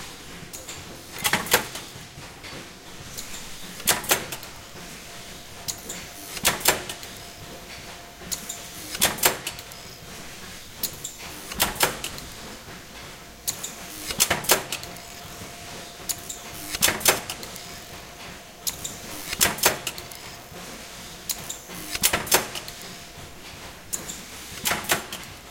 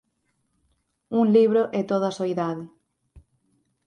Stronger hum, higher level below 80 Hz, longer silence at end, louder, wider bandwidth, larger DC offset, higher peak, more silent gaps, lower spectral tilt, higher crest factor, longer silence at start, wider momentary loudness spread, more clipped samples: neither; first, -50 dBFS vs -64 dBFS; second, 0 s vs 0.7 s; second, -26 LUFS vs -22 LUFS; first, 17 kHz vs 9.4 kHz; neither; first, -2 dBFS vs -8 dBFS; neither; second, -1 dB/octave vs -7.5 dB/octave; first, 28 dB vs 18 dB; second, 0 s vs 1.1 s; first, 18 LU vs 11 LU; neither